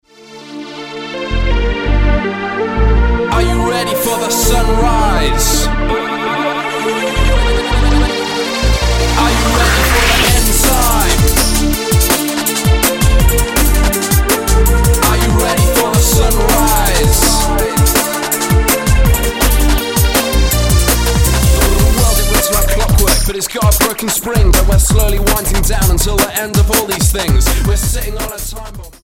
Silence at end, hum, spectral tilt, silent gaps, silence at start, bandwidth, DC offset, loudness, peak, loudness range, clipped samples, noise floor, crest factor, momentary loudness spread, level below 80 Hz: 0.15 s; none; -4 dB/octave; none; 0.3 s; 17 kHz; under 0.1%; -12 LUFS; 0 dBFS; 3 LU; under 0.1%; -35 dBFS; 12 dB; 6 LU; -14 dBFS